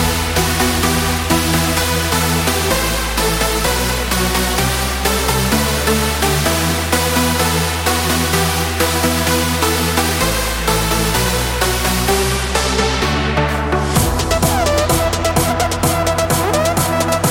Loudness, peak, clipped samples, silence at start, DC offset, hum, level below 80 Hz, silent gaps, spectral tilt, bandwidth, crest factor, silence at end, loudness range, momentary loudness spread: -15 LUFS; 0 dBFS; under 0.1%; 0 s; under 0.1%; none; -24 dBFS; none; -3.5 dB/octave; 17 kHz; 14 dB; 0 s; 1 LU; 2 LU